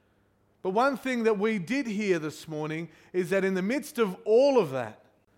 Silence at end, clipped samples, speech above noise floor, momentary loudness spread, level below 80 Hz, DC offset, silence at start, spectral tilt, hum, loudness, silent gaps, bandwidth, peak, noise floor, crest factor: 0.45 s; under 0.1%; 40 dB; 12 LU; -72 dBFS; under 0.1%; 0.65 s; -6 dB/octave; none; -27 LUFS; none; 16.5 kHz; -12 dBFS; -67 dBFS; 16 dB